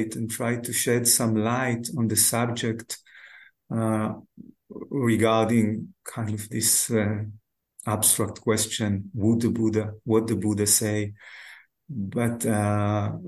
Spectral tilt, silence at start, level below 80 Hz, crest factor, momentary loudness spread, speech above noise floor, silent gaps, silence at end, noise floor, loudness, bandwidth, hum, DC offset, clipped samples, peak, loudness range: -4 dB/octave; 0 s; -54 dBFS; 20 dB; 15 LU; 26 dB; none; 0 s; -51 dBFS; -24 LUFS; 13 kHz; none; under 0.1%; under 0.1%; -4 dBFS; 3 LU